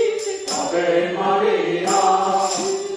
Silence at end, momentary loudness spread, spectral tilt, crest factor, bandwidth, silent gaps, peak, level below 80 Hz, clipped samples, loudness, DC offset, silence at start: 0 s; 6 LU; -3 dB/octave; 14 dB; 10.5 kHz; none; -6 dBFS; -62 dBFS; under 0.1%; -19 LUFS; under 0.1%; 0 s